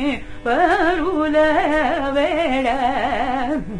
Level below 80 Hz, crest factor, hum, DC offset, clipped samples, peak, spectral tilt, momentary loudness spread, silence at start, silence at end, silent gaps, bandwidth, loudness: -36 dBFS; 14 dB; none; under 0.1%; under 0.1%; -4 dBFS; -5.5 dB/octave; 6 LU; 0 s; 0 s; none; 10.5 kHz; -18 LUFS